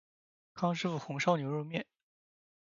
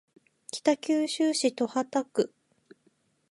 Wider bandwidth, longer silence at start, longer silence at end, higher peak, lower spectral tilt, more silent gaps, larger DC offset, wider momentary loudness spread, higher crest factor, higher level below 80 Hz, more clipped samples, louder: second, 7.4 kHz vs 11.5 kHz; about the same, 0.55 s vs 0.55 s; about the same, 0.95 s vs 1.05 s; second, -14 dBFS vs -10 dBFS; first, -5 dB/octave vs -3 dB/octave; neither; neither; first, 14 LU vs 8 LU; about the same, 22 dB vs 20 dB; about the same, -80 dBFS vs -82 dBFS; neither; second, -34 LUFS vs -28 LUFS